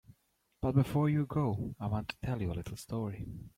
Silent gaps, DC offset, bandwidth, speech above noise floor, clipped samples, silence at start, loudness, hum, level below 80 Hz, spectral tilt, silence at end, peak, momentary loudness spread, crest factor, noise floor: none; under 0.1%; 15.5 kHz; 41 dB; under 0.1%; 0.1 s; -34 LUFS; none; -54 dBFS; -8 dB/octave; 0.1 s; -16 dBFS; 10 LU; 18 dB; -74 dBFS